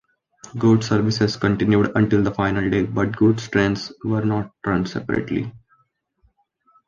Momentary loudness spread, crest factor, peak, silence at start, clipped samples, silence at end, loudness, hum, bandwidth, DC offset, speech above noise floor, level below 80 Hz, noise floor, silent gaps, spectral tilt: 7 LU; 16 dB; -4 dBFS; 0.45 s; under 0.1%; 1.3 s; -20 LUFS; none; 7.4 kHz; under 0.1%; 46 dB; -46 dBFS; -65 dBFS; none; -7 dB/octave